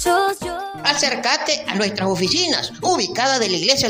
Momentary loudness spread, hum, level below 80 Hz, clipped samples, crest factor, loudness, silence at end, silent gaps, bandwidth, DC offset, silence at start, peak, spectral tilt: 4 LU; none; -50 dBFS; under 0.1%; 18 dB; -18 LUFS; 0 s; none; 16 kHz; under 0.1%; 0 s; 0 dBFS; -2.5 dB/octave